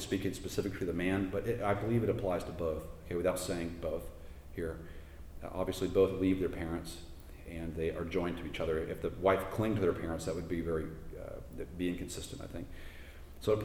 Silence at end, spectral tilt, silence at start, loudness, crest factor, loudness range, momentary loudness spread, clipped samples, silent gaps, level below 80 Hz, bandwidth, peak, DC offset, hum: 0 s; -6 dB/octave; 0 s; -36 LUFS; 20 dB; 4 LU; 17 LU; under 0.1%; none; -50 dBFS; over 20 kHz; -16 dBFS; under 0.1%; none